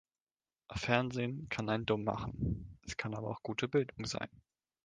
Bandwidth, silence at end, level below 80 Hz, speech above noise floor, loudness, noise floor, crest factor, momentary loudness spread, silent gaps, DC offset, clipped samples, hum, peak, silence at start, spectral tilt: 9.6 kHz; 0.6 s; -54 dBFS; over 54 dB; -37 LUFS; under -90 dBFS; 24 dB; 10 LU; none; under 0.1%; under 0.1%; none; -12 dBFS; 0.7 s; -5.5 dB/octave